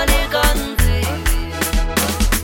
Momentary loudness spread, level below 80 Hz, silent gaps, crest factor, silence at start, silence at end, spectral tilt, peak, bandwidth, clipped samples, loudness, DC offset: 4 LU; -18 dBFS; none; 16 dB; 0 s; 0 s; -3.5 dB/octave; 0 dBFS; 17 kHz; under 0.1%; -18 LUFS; under 0.1%